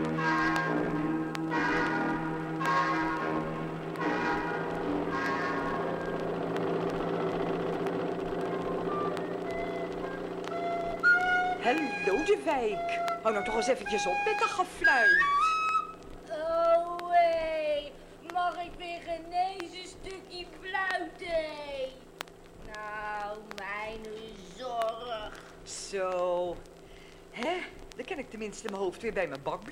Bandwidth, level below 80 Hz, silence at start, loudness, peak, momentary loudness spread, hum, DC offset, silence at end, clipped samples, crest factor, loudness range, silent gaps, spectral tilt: 16 kHz; -54 dBFS; 0 s; -30 LUFS; -10 dBFS; 15 LU; none; under 0.1%; 0 s; under 0.1%; 20 dB; 10 LU; none; -5 dB/octave